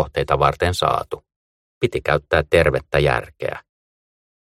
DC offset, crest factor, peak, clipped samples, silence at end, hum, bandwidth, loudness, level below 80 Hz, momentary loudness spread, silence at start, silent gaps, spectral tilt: under 0.1%; 20 dB; -2 dBFS; under 0.1%; 1 s; none; 16 kHz; -19 LUFS; -38 dBFS; 12 LU; 0 s; 1.36-1.81 s; -5.5 dB/octave